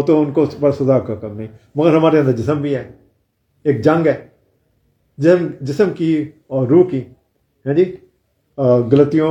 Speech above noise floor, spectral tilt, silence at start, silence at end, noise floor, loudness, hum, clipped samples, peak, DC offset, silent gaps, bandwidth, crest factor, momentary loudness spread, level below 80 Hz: 49 dB; -9 dB/octave; 0 s; 0 s; -63 dBFS; -16 LUFS; none; under 0.1%; 0 dBFS; under 0.1%; none; 8.4 kHz; 16 dB; 13 LU; -56 dBFS